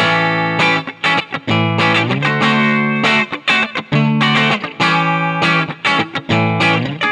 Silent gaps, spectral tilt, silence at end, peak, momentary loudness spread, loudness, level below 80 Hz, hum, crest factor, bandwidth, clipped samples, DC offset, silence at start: none; -5.5 dB/octave; 0 s; -2 dBFS; 3 LU; -14 LUFS; -56 dBFS; none; 12 dB; 11 kHz; under 0.1%; under 0.1%; 0 s